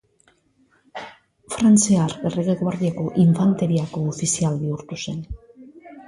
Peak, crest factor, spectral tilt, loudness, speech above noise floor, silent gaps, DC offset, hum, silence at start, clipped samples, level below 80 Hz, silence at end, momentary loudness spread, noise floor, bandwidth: -6 dBFS; 16 dB; -6 dB/octave; -20 LUFS; 42 dB; none; under 0.1%; none; 0.95 s; under 0.1%; -48 dBFS; 0.05 s; 21 LU; -61 dBFS; 11.5 kHz